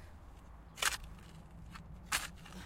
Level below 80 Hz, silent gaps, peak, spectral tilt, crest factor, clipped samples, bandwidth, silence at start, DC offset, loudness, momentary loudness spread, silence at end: -54 dBFS; none; -14 dBFS; -1 dB/octave; 28 dB; under 0.1%; 16.5 kHz; 0 s; under 0.1%; -38 LUFS; 21 LU; 0 s